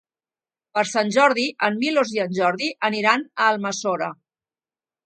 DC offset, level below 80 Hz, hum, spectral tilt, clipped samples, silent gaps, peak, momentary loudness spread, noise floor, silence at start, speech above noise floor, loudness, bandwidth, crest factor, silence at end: under 0.1%; -74 dBFS; none; -3.5 dB/octave; under 0.1%; none; -2 dBFS; 7 LU; under -90 dBFS; 0.75 s; over 69 dB; -21 LUFS; 9.4 kHz; 22 dB; 0.9 s